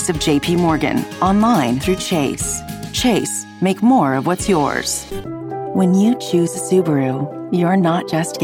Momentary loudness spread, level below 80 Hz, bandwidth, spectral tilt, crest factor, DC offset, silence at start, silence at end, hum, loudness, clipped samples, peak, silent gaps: 9 LU; -40 dBFS; 17.5 kHz; -5 dB/octave; 12 dB; under 0.1%; 0 s; 0 s; none; -17 LUFS; under 0.1%; -4 dBFS; none